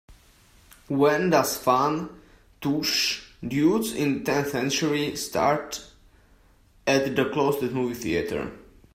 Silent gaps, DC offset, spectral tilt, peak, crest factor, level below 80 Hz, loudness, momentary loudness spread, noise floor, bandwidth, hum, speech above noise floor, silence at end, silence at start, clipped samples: none; under 0.1%; -4.5 dB/octave; -6 dBFS; 20 dB; -56 dBFS; -25 LUFS; 10 LU; -58 dBFS; 16 kHz; none; 33 dB; 0.35 s; 0.1 s; under 0.1%